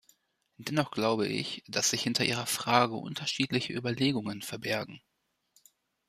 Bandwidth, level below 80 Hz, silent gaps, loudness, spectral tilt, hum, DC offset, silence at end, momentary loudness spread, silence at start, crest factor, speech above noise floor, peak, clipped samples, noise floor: 15 kHz; -70 dBFS; none; -30 LUFS; -3.5 dB/octave; none; under 0.1%; 1.1 s; 8 LU; 0.6 s; 22 dB; 39 dB; -10 dBFS; under 0.1%; -70 dBFS